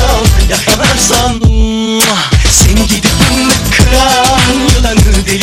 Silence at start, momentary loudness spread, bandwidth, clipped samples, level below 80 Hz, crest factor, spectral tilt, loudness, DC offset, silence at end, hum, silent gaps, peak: 0 s; 3 LU; over 20 kHz; 1%; -12 dBFS; 8 dB; -3.5 dB/octave; -8 LUFS; under 0.1%; 0 s; none; none; 0 dBFS